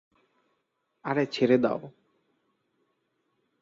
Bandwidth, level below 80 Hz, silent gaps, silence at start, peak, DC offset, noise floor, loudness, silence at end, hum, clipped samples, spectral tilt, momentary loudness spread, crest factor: 7.6 kHz; -72 dBFS; none; 1.05 s; -10 dBFS; under 0.1%; -77 dBFS; -26 LUFS; 1.7 s; none; under 0.1%; -7 dB/octave; 13 LU; 22 dB